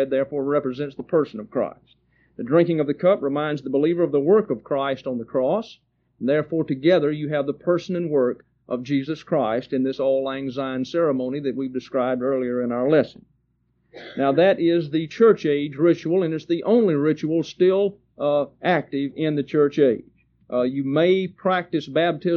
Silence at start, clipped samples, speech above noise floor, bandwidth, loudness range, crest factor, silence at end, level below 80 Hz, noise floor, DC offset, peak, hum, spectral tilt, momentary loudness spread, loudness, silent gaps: 0 s; under 0.1%; 46 dB; 6.8 kHz; 4 LU; 18 dB; 0 s; -64 dBFS; -67 dBFS; under 0.1%; -4 dBFS; none; -6 dB/octave; 9 LU; -22 LUFS; none